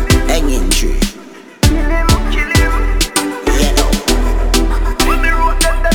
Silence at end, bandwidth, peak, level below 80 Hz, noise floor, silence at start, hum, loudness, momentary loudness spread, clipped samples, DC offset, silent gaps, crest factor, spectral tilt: 0 s; 18.5 kHz; 0 dBFS; -14 dBFS; -34 dBFS; 0 s; none; -14 LUFS; 3 LU; under 0.1%; under 0.1%; none; 12 dB; -4 dB/octave